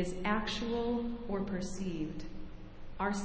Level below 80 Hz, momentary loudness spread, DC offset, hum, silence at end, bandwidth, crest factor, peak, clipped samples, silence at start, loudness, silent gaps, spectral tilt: -48 dBFS; 16 LU; under 0.1%; none; 0 s; 8 kHz; 18 dB; -16 dBFS; under 0.1%; 0 s; -36 LUFS; none; -5.5 dB/octave